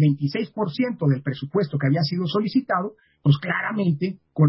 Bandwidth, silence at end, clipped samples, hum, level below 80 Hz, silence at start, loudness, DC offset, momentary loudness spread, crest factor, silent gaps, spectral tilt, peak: 5.8 kHz; 0 s; under 0.1%; none; -62 dBFS; 0 s; -23 LUFS; under 0.1%; 5 LU; 16 dB; none; -11.5 dB/octave; -6 dBFS